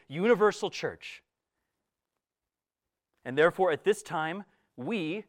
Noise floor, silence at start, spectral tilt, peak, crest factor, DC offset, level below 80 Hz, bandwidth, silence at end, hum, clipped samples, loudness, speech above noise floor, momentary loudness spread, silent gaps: under -90 dBFS; 0.1 s; -5 dB/octave; -10 dBFS; 20 dB; under 0.1%; -76 dBFS; 15.5 kHz; 0.05 s; none; under 0.1%; -28 LUFS; over 61 dB; 18 LU; none